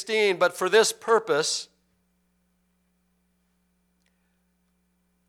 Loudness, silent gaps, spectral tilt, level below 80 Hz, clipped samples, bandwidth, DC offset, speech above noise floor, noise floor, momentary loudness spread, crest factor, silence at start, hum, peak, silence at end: -23 LUFS; none; -2 dB/octave; -78 dBFS; under 0.1%; 16 kHz; under 0.1%; 48 dB; -70 dBFS; 5 LU; 22 dB; 0 s; none; -6 dBFS; 3.65 s